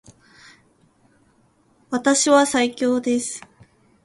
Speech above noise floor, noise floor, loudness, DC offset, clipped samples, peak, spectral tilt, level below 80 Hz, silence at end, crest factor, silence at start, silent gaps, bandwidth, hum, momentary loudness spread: 41 dB; -60 dBFS; -19 LUFS; under 0.1%; under 0.1%; -2 dBFS; -2 dB/octave; -64 dBFS; 0.65 s; 20 dB; 1.9 s; none; 11.5 kHz; none; 14 LU